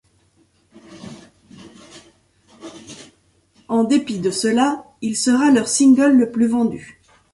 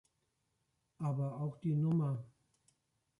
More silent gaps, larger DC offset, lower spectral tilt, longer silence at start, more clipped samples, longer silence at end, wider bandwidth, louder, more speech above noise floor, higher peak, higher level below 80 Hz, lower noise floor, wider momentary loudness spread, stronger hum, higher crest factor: neither; neither; second, -4 dB/octave vs -10.5 dB/octave; about the same, 0.9 s vs 1 s; neither; second, 0.5 s vs 0.9 s; first, 11.5 kHz vs 6.8 kHz; first, -17 LUFS vs -37 LUFS; second, 43 dB vs 47 dB; first, -4 dBFS vs -26 dBFS; first, -60 dBFS vs -76 dBFS; second, -59 dBFS vs -82 dBFS; first, 25 LU vs 8 LU; neither; about the same, 16 dB vs 14 dB